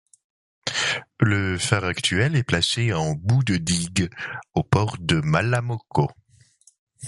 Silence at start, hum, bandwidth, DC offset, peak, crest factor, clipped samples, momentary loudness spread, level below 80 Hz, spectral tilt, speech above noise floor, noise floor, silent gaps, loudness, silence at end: 0.65 s; none; 11.5 kHz; under 0.1%; -4 dBFS; 20 dB; under 0.1%; 7 LU; -42 dBFS; -4.5 dB/octave; 35 dB; -57 dBFS; 6.79-6.87 s; -23 LUFS; 0 s